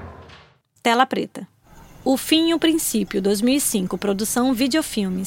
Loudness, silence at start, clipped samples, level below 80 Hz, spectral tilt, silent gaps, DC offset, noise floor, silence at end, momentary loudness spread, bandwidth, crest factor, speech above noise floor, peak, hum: -20 LUFS; 0 s; under 0.1%; -50 dBFS; -3.5 dB/octave; none; under 0.1%; -51 dBFS; 0 s; 9 LU; 17 kHz; 20 dB; 31 dB; -2 dBFS; none